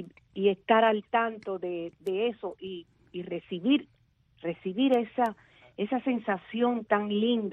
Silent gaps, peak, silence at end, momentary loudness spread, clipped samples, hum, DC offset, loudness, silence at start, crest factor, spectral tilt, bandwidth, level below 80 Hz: none; -10 dBFS; 0 s; 15 LU; under 0.1%; none; under 0.1%; -29 LUFS; 0 s; 20 dB; -7.5 dB/octave; 5.8 kHz; -72 dBFS